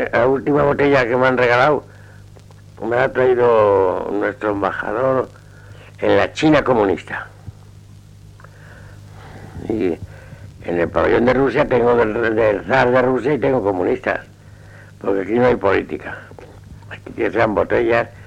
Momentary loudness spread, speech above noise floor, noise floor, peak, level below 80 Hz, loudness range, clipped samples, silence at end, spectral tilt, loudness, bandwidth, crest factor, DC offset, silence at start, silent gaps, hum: 15 LU; 25 dB; -41 dBFS; -2 dBFS; -44 dBFS; 8 LU; under 0.1%; 0 s; -7 dB/octave; -17 LUFS; 9.6 kHz; 16 dB; under 0.1%; 0 s; none; none